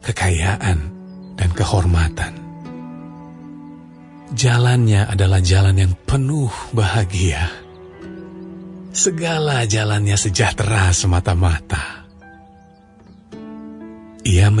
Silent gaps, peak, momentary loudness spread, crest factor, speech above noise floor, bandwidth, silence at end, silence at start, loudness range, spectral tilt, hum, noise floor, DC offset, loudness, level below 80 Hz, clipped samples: none; -2 dBFS; 22 LU; 16 dB; 30 dB; 11 kHz; 0 s; 0.05 s; 6 LU; -4.5 dB/octave; none; -46 dBFS; under 0.1%; -17 LUFS; -34 dBFS; under 0.1%